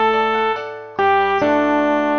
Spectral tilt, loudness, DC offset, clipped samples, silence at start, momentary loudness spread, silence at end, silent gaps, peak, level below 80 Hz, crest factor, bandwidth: -5.5 dB/octave; -17 LUFS; under 0.1%; under 0.1%; 0 s; 7 LU; 0 s; none; -4 dBFS; -60 dBFS; 14 dB; 6.6 kHz